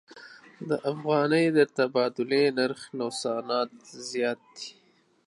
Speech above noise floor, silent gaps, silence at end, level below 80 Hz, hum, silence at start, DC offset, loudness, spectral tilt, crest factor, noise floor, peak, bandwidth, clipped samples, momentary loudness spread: 23 dB; none; 0.55 s; -80 dBFS; none; 0.15 s; under 0.1%; -27 LUFS; -5 dB/octave; 20 dB; -49 dBFS; -8 dBFS; 11.5 kHz; under 0.1%; 18 LU